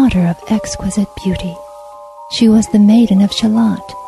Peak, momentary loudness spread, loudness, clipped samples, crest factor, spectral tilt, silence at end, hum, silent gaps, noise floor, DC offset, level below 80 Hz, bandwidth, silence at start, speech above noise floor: -2 dBFS; 13 LU; -13 LUFS; under 0.1%; 12 dB; -6 dB/octave; 0 s; none; none; -34 dBFS; under 0.1%; -36 dBFS; 12.5 kHz; 0 s; 21 dB